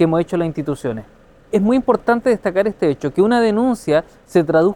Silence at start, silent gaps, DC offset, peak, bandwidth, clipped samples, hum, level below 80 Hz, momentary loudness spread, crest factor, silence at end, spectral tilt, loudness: 0 s; none; under 0.1%; -2 dBFS; 16.5 kHz; under 0.1%; none; -48 dBFS; 8 LU; 16 dB; 0 s; -7 dB/octave; -17 LUFS